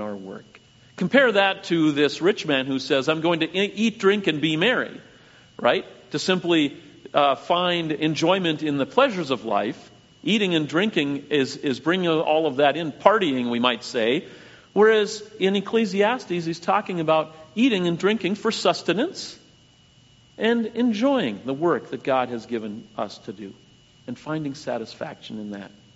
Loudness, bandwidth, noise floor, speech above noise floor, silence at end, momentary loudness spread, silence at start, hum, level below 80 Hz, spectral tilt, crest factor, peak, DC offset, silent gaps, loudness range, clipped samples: -22 LUFS; 8 kHz; -55 dBFS; 32 dB; 0.25 s; 13 LU; 0 s; none; -66 dBFS; -3 dB/octave; 24 dB; 0 dBFS; under 0.1%; none; 4 LU; under 0.1%